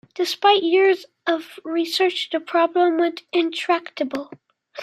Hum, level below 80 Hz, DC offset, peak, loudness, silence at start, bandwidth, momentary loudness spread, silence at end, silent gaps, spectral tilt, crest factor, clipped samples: none; -78 dBFS; under 0.1%; -2 dBFS; -21 LUFS; 0.15 s; 15 kHz; 10 LU; 0 s; none; -2.5 dB/octave; 18 dB; under 0.1%